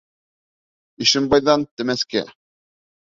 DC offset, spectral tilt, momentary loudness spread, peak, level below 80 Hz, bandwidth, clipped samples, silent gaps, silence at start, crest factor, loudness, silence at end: under 0.1%; -3.5 dB/octave; 9 LU; -2 dBFS; -54 dBFS; 7.8 kHz; under 0.1%; 1.71-1.77 s; 1 s; 20 dB; -19 LUFS; 0.75 s